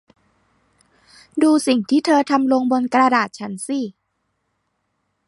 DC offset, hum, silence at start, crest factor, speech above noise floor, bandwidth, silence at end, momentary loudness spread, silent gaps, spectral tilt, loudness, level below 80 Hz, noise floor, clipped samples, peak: under 0.1%; 50 Hz at -50 dBFS; 1.35 s; 18 dB; 55 dB; 11.5 kHz; 1.4 s; 11 LU; none; -4 dB/octave; -18 LUFS; -70 dBFS; -72 dBFS; under 0.1%; -2 dBFS